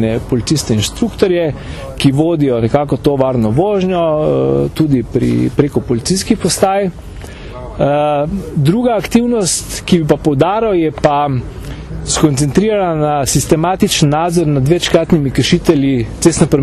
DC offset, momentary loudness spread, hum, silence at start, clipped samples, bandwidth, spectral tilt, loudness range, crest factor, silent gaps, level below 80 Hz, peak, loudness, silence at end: under 0.1%; 6 LU; none; 0 s; under 0.1%; 14 kHz; -5.5 dB/octave; 3 LU; 12 dB; none; -32 dBFS; 0 dBFS; -13 LUFS; 0 s